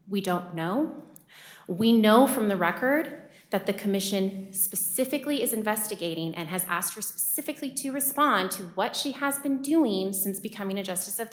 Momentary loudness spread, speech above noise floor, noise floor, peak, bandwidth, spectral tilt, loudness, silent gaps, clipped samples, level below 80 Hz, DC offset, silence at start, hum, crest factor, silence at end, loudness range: 10 LU; 24 dB; -51 dBFS; -6 dBFS; over 20 kHz; -3.5 dB/octave; -27 LUFS; none; under 0.1%; -72 dBFS; under 0.1%; 0.05 s; none; 20 dB; 0 s; 3 LU